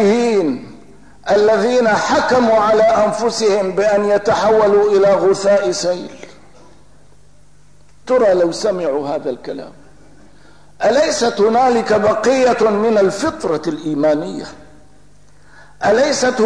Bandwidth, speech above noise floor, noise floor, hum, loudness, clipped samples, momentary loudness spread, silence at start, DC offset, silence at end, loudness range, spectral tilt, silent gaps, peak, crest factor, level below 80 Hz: 10.5 kHz; 36 dB; -50 dBFS; 50 Hz at -50 dBFS; -15 LUFS; under 0.1%; 10 LU; 0 s; 0.8%; 0 s; 6 LU; -4.5 dB/octave; none; -4 dBFS; 10 dB; -50 dBFS